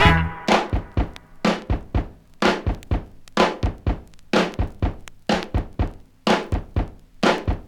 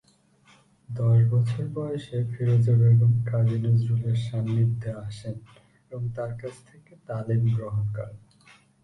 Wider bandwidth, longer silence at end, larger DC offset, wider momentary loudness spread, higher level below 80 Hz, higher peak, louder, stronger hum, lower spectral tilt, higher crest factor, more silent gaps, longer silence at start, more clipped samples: first, 13.5 kHz vs 9.2 kHz; second, 0.05 s vs 0.65 s; neither; second, 8 LU vs 17 LU; first, -30 dBFS vs -54 dBFS; first, 0 dBFS vs -10 dBFS; about the same, -24 LUFS vs -25 LUFS; neither; second, -5.5 dB/octave vs -9 dB/octave; first, 22 dB vs 14 dB; neither; second, 0 s vs 0.9 s; neither